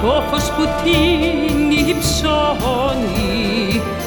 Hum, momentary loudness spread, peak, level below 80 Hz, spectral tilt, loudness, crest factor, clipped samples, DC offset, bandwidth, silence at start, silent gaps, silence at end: none; 4 LU; -2 dBFS; -28 dBFS; -4.5 dB/octave; -16 LUFS; 14 dB; under 0.1%; under 0.1%; over 20 kHz; 0 s; none; 0 s